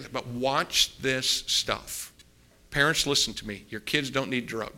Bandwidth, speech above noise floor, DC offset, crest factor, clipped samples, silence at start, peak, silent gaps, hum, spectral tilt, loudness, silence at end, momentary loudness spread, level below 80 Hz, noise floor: 16.5 kHz; 30 dB; under 0.1%; 22 dB; under 0.1%; 0 s; -6 dBFS; none; none; -2 dB/octave; -26 LUFS; 0 s; 14 LU; -52 dBFS; -58 dBFS